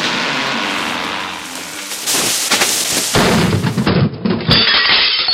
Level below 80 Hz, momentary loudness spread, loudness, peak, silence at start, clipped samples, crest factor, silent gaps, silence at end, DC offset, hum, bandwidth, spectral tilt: -40 dBFS; 13 LU; -13 LUFS; 0 dBFS; 0 s; under 0.1%; 16 dB; none; 0 s; under 0.1%; none; 16 kHz; -2.5 dB/octave